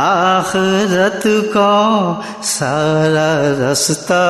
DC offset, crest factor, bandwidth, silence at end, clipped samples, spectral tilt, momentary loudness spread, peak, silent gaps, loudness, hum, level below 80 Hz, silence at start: under 0.1%; 12 dB; 12.5 kHz; 0 s; under 0.1%; -4 dB/octave; 4 LU; -2 dBFS; none; -14 LUFS; none; -54 dBFS; 0 s